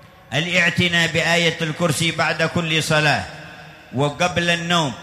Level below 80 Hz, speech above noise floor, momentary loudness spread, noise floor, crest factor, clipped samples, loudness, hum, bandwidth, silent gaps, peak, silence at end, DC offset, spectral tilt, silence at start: -50 dBFS; 21 dB; 8 LU; -40 dBFS; 16 dB; under 0.1%; -18 LUFS; none; 15 kHz; none; -4 dBFS; 0 s; under 0.1%; -4 dB/octave; 0.05 s